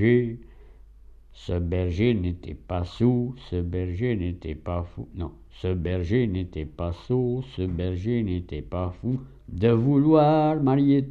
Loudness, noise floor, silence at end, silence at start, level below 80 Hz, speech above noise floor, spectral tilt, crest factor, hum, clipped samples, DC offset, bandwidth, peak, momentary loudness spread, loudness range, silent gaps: -25 LUFS; -48 dBFS; 0 s; 0 s; -42 dBFS; 24 dB; -9.5 dB/octave; 16 dB; none; under 0.1%; under 0.1%; 7.2 kHz; -8 dBFS; 14 LU; 6 LU; none